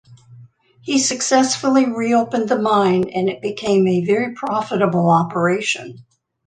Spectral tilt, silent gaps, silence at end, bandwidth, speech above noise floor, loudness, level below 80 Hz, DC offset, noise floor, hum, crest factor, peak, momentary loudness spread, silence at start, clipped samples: -4.5 dB/octave; none; 0.45 s; 9.8 kHz; 29 dB; -18 LUFS; -62 dBFS; under 0.1%; -46 dBFS; none; 16 dB; -2 dBFS; 6 LU; 0.1 s; under 0.1%